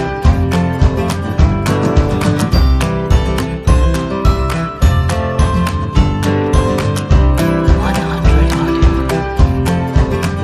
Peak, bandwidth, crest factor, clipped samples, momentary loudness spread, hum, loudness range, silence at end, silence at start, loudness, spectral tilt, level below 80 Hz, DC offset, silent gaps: 0 dBFS; 14 kHz; 12 dB; under 0.1%; 3 LU; none; 1 LU; 0 s; 0 s; -14 LUFS; -6.5 dB/octave; -16 dBFS; under 0.1%; none